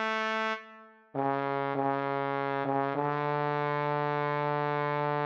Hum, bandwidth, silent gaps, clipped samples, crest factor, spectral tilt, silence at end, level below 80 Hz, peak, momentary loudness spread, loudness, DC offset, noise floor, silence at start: none; 7.4 kHz; none; under 0.1%; 16 dB; -7 dB/octave; 0 s; -84 dBFS; -16 dBFS; 3 LU; -31 LUFS; under 0.1%; -53 dBFS; 0 s